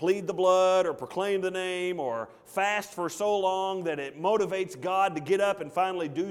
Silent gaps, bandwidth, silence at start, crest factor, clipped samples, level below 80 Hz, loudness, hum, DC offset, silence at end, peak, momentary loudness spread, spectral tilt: none; 15.5 kHz; 0 s; 16 dB; under 0.1%; -72 dBFS; -28 LUFS; none; under 0.1%; 0 s; -10 dBFS; 8 LU; -4.5 dB/octave